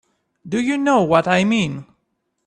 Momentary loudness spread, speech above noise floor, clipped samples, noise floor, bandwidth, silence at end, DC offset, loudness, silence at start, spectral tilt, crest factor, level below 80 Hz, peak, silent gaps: 10 LU; 55 dB; under 0.1%; -72 dBFS; 10.5 kHz; 0.65 s; under 0.1%; -18 LUFS; 0.45 s; -5.5 dB/octave; 20 dB; -58 dBFS; 0 dBFS; none